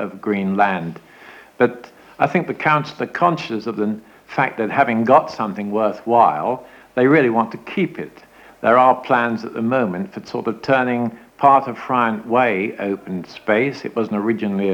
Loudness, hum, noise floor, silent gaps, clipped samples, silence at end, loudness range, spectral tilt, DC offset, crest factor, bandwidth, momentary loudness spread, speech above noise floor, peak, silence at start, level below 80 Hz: -19 LUFS; none; -43 dBFS; none; under 0.1%; 0 s; 3 LU; -7.5 dB/octave; under 0.1%; 18 dB; 19 kHz; 12 LU; 25 dB; 0 dBFS; 0 s; -64 dBFS